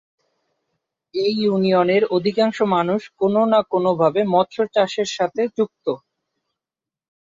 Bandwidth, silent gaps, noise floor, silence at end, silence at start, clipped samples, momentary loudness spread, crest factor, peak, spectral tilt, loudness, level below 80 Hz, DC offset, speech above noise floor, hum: 7.8 kHz; none; -89 dBFS; 1.4 s; 1.15 s; under 0.1%; 7 LU; 16 dB; -4 dBFS; -6 dB/octave; -19 LUFS; -66 dBFS; under 0.1%; 70 dB; none